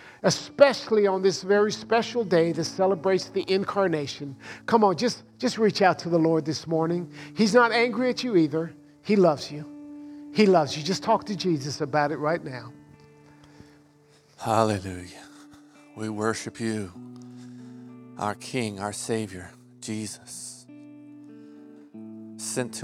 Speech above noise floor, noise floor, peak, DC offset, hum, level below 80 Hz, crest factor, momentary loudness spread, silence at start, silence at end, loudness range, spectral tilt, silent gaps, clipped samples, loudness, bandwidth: 33 dB; -58 dBFS; -2 dBFS; under 0.1%; none; -68 dBFS; 24 dB; 21 LU; 0 s; 0 s; 11 LU; -5 dB/octave; none; under 0.1%; -25 LUFS; 15 kHz